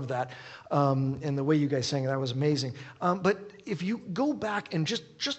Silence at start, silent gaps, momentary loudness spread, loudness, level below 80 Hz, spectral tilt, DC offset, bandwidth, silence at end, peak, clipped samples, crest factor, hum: 0 s; none; 8 LU; -30 LUFS; -68 dBFS; -6 dB/octave; under 0.1%; 8.4 kHz; 0 s; -12 dBFS; under 0.1%; 18 dB; none